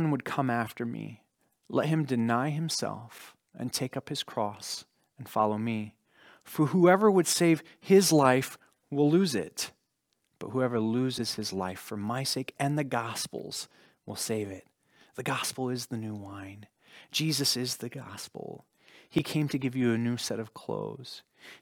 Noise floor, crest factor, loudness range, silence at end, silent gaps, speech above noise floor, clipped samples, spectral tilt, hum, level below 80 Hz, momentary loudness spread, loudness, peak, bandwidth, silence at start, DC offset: -78 dBFS; 22 dB; 9 LU; 0.05 s; none; 49 dB; under 0.1%; -4.5 dB/octave; none; -72 dBFS; 20 LU; -29 LUFS; -8 dBFS; over 20 kHz; 0 s; under 0.1%